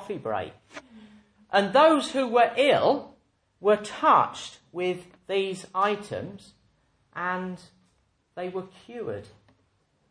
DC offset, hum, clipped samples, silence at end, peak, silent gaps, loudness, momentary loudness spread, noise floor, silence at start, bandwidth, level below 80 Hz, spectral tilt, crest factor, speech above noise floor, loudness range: under 0.1%; none; under 0.1%; 0.85 s; -8 dBFS; none; -25 LUFS; 20 LU; -69 dBFS; 0 s; 10.5 kHz; -70 dBFS; -4.5 dB/octave; 20 dB; 44 dB; 14 LU